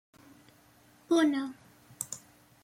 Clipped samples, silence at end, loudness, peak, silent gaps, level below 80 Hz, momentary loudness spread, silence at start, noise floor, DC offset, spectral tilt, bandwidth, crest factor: under 0.1%; 0.45 s; -31 LUFS; -16 dBFS; none; -78 dBFS; 15 LU; 1.1 s; -61 dBFS; under 0.1%; -3 dB/octave; 16.5 kHz; 18 dB